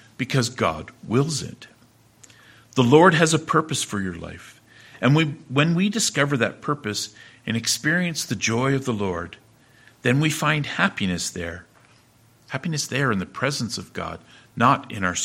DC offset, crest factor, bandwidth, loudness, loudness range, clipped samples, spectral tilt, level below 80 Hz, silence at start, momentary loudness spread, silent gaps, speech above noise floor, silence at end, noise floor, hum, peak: under 0.1%; 22 dB; 16.5 kHz; -22 LUFS; 5 LU; under 0.1%; -4.5 dB/octave; -56 dBFS; 0.2 s; 14 LU; none; 34 dB; 0 s; -56 dBFS; none; 0 dBFS